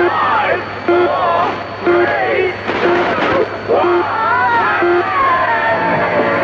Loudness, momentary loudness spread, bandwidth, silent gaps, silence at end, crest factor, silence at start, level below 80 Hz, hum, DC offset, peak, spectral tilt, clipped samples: -14 LUFS; 4 LU; 7 kHz; none; 0 s; 12 dB; 0 s; -48 dBFS; none; under 0.1%; -2 dBFS; -6.5 dB/octave; under 0.1%